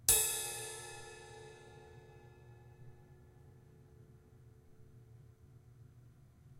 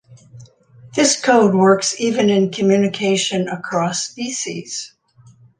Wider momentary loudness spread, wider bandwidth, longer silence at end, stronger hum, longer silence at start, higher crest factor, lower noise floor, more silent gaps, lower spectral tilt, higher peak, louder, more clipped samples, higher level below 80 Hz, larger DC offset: first, 24 LU vs 13 LU; first, 16.5 kHz vs 10 kHz; second, 0 s vs 0.7 s; neither; about the same, 0 s vs 0.1 s; first, 32 dB vs 16 dB; first, -61 dBFS vs -49 dBFS; neither; second, -0.5 dB/octave vs -4 dB/octave; second, -10 dBFS vs -2 dBFS; second, -35 LUFS vs -17 LUFS; neither; about the same, -64 dBFS vs -62 dBFS; neither